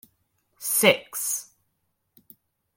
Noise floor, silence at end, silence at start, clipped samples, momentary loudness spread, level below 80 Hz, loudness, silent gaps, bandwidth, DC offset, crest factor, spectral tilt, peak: -75 dBFS; 1.35 s; 0.6 s; under 0.1%; 12 LU; -76 dBFS; -23 LUFS; none; 17 kHz; under 0.1%; 24 dB; -1.5 dB/octave; -4 dBFS